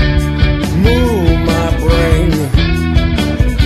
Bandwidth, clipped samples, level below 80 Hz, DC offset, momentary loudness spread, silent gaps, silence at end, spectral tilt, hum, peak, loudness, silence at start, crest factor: 14 kHz; under 0.1%; -16 dBFS; under 0.1%; 3 LU; none; 0 s; -6.5 dB/octave; none; 0 dBFS; -13 LUFS; 0 s; 10 dB